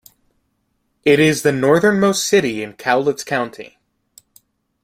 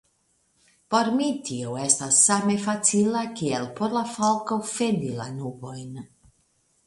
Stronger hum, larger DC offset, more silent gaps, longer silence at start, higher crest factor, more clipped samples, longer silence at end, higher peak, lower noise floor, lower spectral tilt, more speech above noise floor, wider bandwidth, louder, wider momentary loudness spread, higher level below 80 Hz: neither; neither; neither; first, 1.05 s vs 0.9 s; about the same, 18 dB vs 22 dB; neither; first, 1.2 s vs 0.8 s; first, 0 dBFS vs -4 dBFS; about the same, -68 dBFS vs -68 dBFS; about the same, -4.5 dB/octave vs -3.5 dB/octave; first, 52 dB vs 44 dB; first, 16 kHz vs 11.5 kHz; first, -16 LUFS vs -23 LUFS; second, 10 LU vs 17 LU; first, -58 dBFS vs -66 dBFS